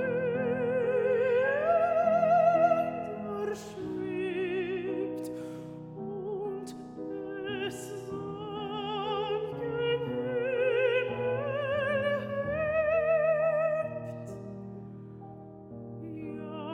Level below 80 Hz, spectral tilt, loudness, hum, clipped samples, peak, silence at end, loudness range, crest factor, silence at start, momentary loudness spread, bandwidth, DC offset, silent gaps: -62 dBFS; -6 dB/octave; -30 LUFS; none; under 0.1%; -14 dBFS; 0 s; 10 LU; 16 dB; 0 s; 17 LU; 13.5 kHz; under 0.1%; none